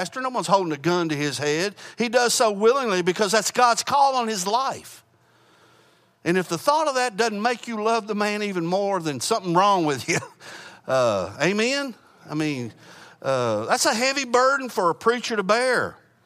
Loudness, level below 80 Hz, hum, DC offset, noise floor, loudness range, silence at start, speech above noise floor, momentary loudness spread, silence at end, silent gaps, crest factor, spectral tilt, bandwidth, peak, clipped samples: -22 LUFS; -72 dBFS; none; under 0.1%; -59 dBFS; 5 LU; 0 s; 36 dB; 9 LU; 0.3 s; none; 18 dB; -3.5 dB/octave; 15.5 kHz; -4 dBFS; under 0.1%